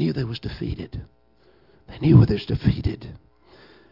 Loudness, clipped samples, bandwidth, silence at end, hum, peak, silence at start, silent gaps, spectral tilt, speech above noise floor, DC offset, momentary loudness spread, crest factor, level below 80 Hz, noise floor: -22 LUFS; under 0.1%; 5.8 kHz; 0.75 s; none; -2 dBFS; 0 s; none; -10 dB/octave; 38 dB; under 0.1%; 21 LU; 20 dB; -38 dBFS; -59 dBFS